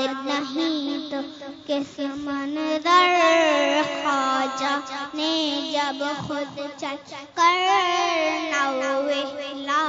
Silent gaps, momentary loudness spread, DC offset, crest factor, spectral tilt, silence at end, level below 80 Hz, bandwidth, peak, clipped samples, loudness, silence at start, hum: none; 14 LU; under 0.1%; 18 dB; -2.5 dB/octave; 0 s; -68 dBFS; 7.8 kHz; -6 dBFS; under 0.1%; -23 LUFS; 0 s; none